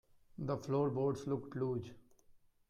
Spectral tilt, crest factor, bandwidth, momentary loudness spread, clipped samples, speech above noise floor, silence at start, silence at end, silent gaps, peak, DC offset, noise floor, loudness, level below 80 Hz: -8.5 dB/octave; 14 dB; 11 kHz; 12 LU; under 0.1%; 29 dB; 0.35 s; 0.35 s; none; -24 dBFS; under 0.1%; -66 dBFS; -38 LUFS; -70 dBFS